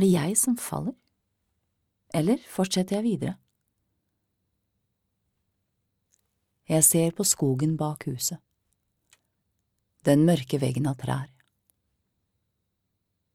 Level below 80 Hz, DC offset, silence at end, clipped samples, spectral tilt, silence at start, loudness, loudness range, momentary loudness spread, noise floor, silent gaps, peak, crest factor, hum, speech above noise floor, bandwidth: -64 dBFS; under 0.1%; 2.1 s; under 0.1%; -5 dB/octave; 0 s; -25 LUFS; 7 LU; 13 LU; -79 dBFS; none; -6 dBFS; 22 dB; none; 54 dB; 17.5 kHz